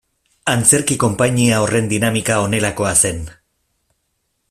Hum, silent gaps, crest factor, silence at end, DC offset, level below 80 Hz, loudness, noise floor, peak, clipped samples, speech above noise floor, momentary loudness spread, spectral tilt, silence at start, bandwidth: none; none; 18 dB; 1.15 s; under 0.1%; -44 dBFS; -15 LUFS; -69 dBFS; 0 dBFS; under 0.1%; 54 dB; 7 LU; -4 dB/octave; 0.45 s; 16 kHz